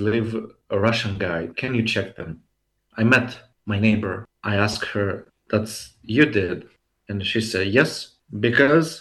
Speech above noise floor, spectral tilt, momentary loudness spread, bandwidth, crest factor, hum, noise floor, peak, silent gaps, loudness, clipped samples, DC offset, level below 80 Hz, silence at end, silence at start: 36 dB; -5.5 dB/octave; 16 LU; 12.5 kHz; 20 dB; none; -57 dBFS; -2 dBFS; none; -22 LUFS; under 0.1%; under 0.1%; -54 dBFS; 0 s; 0 s